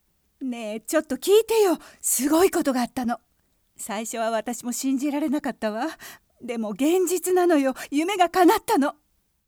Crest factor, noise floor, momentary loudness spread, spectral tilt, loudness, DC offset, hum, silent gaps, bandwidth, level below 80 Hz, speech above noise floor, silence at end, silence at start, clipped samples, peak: 18 dB; -67 dBFS; 13 LU; -3 dB/octave; -23 LUFS; under 0.1%; none; none; over 20 kHz; -62 dBFS; 44 dB; 0.55 s; 0.4 s; under 0.1%; -6 dBFS